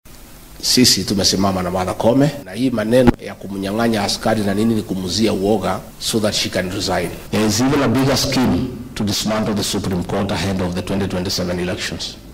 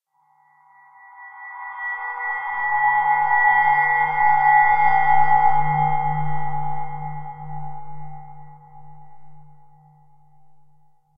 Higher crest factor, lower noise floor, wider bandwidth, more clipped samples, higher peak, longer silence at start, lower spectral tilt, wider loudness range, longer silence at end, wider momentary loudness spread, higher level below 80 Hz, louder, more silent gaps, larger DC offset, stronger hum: about the same, 16 dB vs 16 dB; second, -39 dBFS vs -60 dBFS; first, 16 kHz vs 5.2 kHz; neither; about the same, -2 dBFS vs -4 dBFS; about the same, 0.05 s vs 0 s; second, -4.5 dB/octave vs -8 dB/octave; second, 4 LU vs 18 LU; about the same, 0 s vs 0 s; second, 8 LU vs 21 LU; first, -38 dBFS vs -52 dBFS; about the same, -18 LUFS vs -19 LUFS; neither; neither; neither